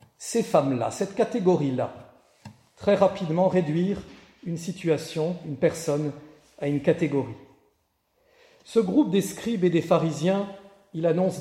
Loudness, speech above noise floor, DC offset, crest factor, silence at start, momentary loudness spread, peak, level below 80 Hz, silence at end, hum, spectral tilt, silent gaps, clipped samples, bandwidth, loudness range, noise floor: -25 LUFS; 47 dB; under 0.1%; 20 dB; 0.2 s; 11 LU; -6 dBFS; -62 dBFS; 0 s; none; -6.5 dB/octave; none; under 0.1%; 16 kHz; 3 LU; -71 dBFS